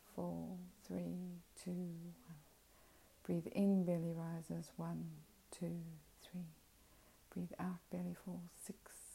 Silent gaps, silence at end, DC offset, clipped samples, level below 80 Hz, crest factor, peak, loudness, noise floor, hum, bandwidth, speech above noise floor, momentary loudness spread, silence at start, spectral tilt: none; 0 s; under 0.1%; under 0.1%; -74 dBFS; 18 dB; -28 dBFS; -46 LUFS; -68 dBFS; none; 16 kHz; 25 dB; 18 LU; 0 s; -7.5 dB/octave